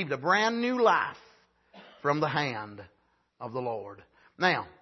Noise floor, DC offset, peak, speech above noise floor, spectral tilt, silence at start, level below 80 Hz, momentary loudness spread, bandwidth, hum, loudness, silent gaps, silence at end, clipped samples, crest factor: -61 dBFS; under 0.1%; -10 dBFS; 33 dB; -5 dB/octave; 0 s; -74 dBFS; 18 LU; 6.2 kHz; none; -28 LUFS; none; 0.1 s; under 0.1%; 20 dB